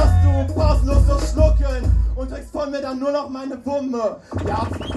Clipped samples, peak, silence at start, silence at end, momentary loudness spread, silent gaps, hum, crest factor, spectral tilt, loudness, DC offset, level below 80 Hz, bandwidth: under 0.1%; -2 dBFS; 0 s; 0 s; 10 LU; none; none; 16 dB; -7.5 dB/octave; -21 LUFS; under 0.1%; -20 dBFS; 11.5 kHz